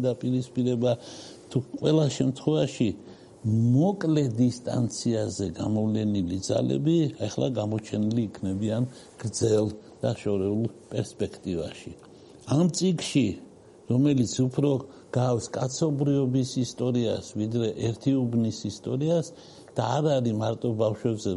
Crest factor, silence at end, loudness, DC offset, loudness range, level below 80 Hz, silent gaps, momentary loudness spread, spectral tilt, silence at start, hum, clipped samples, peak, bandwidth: 16 dB; 0 s; -27 LUFS; under 0.1%; 3 LU; -60 dBFS; none; 9 LU; -6.5 dB/octave; 0 s; none; under 0.1%; -10 dBFS; 11.5 kHz